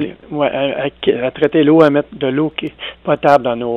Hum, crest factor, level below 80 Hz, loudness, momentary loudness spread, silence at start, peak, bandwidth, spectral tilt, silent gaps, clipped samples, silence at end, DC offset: none; 14 dB; -50 dBFS; -15 LUFS; 12 LU; 0 s; 0 dBFS; 7.4 kHz; -7.5 dB/octave; none; under 0.1%; 0 s; under 0.1%